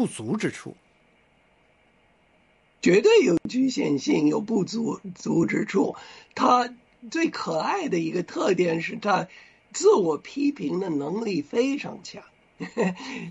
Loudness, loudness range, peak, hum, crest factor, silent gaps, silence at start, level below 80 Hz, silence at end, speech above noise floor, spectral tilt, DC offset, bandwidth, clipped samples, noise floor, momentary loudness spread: -24 LUFS; 3 LU; -8 dBFS; none; 16 dB; none; 0 s; -66 dBFS; 0 s; 38 dB; -5.5 dB/octave; under 0.1%; 11.5 kHz; under 0.1%; -62 dBFS; 15 LU